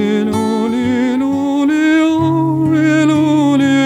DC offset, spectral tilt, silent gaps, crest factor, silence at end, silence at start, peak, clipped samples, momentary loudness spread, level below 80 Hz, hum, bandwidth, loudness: under 0.1%; -6.5 dB/octave; none; 10 dB; 0 s; 0 s; -2 dBFS; under 0.1%; 4 LU; -52 dBFS; none; 11.5 kHz; -13 LUFS